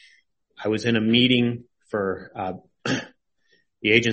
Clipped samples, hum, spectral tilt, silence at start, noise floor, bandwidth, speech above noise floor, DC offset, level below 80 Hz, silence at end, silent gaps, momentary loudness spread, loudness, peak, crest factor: under 0.1%; none; -5 dB/octave; 0.6 s; -66 dBFS; 8.4 kHz; 44 dB; under 0.1%; -58 dBFS; 0 s; none; 14 LU; -23 LUFS; -4 dBFS; 20 dB